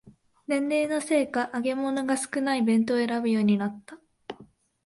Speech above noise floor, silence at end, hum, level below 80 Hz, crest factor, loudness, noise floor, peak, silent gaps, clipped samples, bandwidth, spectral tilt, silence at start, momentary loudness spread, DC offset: 30 dB; 0.45 s; none; -70 dBFS; 14 dB; -26 LUFS; -55 dBFS; -12 dBFS; none; under 0.1%; 11.5 kHz; -5 dB/octave; 0.05 s; 20 LU; under 0.1%